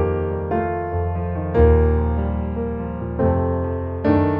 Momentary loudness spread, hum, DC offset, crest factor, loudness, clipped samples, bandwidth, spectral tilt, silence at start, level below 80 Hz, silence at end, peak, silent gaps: 9 LU; none; under 0.1%; 16 dB; -21 LUFS; under 0.1%; 4.5 kHz; -12 dB/octave; 0 s; -26 dBFS; 0 s; -4 dBFS; none